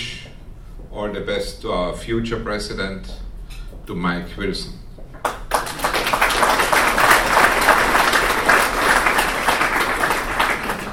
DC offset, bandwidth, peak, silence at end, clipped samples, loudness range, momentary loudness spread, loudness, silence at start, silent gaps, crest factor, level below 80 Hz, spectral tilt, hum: 0.4%; 17 kHz; 0 dBFS; 0 s; under 0.1%; 12 LU; 18 LU; -18 LUFS; 0 s; none; 20 dB; -34 dBFS; -2.5 dB/octave; none